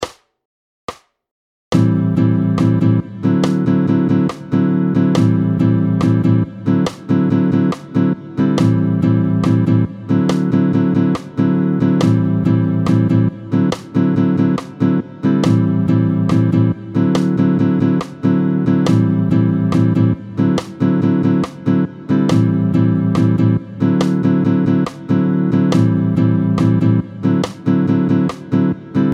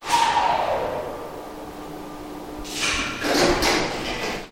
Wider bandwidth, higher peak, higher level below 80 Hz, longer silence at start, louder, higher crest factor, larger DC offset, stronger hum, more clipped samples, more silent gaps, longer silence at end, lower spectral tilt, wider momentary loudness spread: second, 10.5 kHz vs 17.5 kHz; first, 0 dBFS vs -4 dBFS; second, -48 dBFS vs -42 dBFS; about the same, 0 s vs 0 s; first, -15 LUFS vs -22 LUFS; second, 14 dB vs 20 dB; neither; neither; neither; first, 0.45-0.88 s, 1.31-1.71 s vs none; about the same, 0 s vs 0 s; first, -8.5 dB/octave vs -2.5 dB/octave; second, 4 LU vs 17 LU